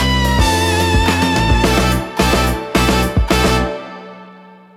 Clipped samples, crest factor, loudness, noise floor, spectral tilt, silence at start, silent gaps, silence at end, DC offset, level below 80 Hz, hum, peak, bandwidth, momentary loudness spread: under 0.1%; 14 dB; -14 LUFS; -40 dBFS; -4.5 dB/octave; 0 s; none; 0.4 s; under 0.1%; -22 dBFS; none; 0 dBFS; 16.5 kHz; 5 LU